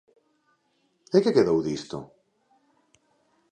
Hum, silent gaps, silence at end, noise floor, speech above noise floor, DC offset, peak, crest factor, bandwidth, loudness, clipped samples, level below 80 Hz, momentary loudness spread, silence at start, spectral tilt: none; none; 1.45 s; -70 dBFS; 48 dB; under 0.1%; -6 dBFS; 22 dB; 9.2 kHz; -24 LUFS; under 0.1%; -64 dBFS; 17 LU; 1.15 s; -6.5 dB/octave